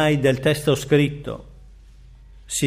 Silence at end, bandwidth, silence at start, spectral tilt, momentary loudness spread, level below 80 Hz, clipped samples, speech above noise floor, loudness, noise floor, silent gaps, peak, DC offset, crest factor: 0 s; 15.5 kHz; 0 s; -5 dB/octave; 15 LU; -44 dBFS; under 0.1%; 26 dB; -20 LUFS; -45 dBFS; none; -6 dBFS; under 0.1%; 16 dB